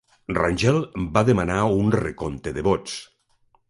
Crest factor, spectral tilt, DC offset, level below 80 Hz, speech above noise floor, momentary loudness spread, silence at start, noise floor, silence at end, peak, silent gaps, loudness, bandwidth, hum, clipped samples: 20 dB; -6.5 dB/octave; under 0.1%; -42 dBFS; 42 dB; 10 LU; 0.3 s; -63 dBFS; 0.65 s; -4 dBFS; none; -22 LUFS; 11.5 kHz; none; under 0.1%